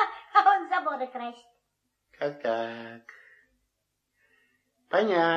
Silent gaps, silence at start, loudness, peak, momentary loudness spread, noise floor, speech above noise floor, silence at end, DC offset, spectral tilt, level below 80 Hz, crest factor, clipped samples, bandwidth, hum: none; 0 s; -27 LUFS; -6 dBFS; 19 LU; -79 dBFS; 51 dB; 0 s; under 0.1%; -5.5 dB/octave; -82 dBFS; 22 dB; under 0.1%; 7.4 kHz; 50 Hz at -75 dBFS